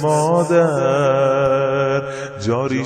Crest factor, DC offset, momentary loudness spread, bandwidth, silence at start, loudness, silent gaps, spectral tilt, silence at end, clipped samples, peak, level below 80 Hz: 14 dB; under 0.1%; 7 LU; 12 kHz; 0 s; -17 LUFS; none; -6.5 dB/octave; 0 s; under 0.1%; -2 dBFS; -50 dBFS